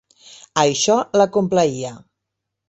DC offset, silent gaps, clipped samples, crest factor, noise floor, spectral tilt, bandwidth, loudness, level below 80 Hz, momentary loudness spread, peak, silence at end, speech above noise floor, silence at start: under 0.1%; none; under 0.1%; 18 dB; -80 dBFS; -4 dB/octave; 8.2 kHz; -18 LUFS; -60 dBFS; 11 LU; -2 dBFS; 0.7 s; 63 dB; 0.55 s